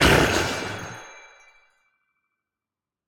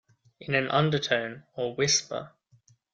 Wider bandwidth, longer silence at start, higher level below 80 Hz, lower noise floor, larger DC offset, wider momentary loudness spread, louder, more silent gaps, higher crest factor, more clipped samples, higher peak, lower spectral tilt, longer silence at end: first, 18 kHz vs 9.2 kHz; second, 0 s vs 0.4 s; first, -40 dBFS vs -66 dBFS; first, -89 dBFS vs -63 dBFS; neither; first, 23 LU vs 13 LU; first, -22 LUFS vs -27 LUFS; neither; about the same, 22 dB vs 20 dB; neither; first, -4 dBFS vs -8 dBFS; about the same, -4 dB/octave vs -3.5 dB/octave; first, 1.9 s vs 0.65 s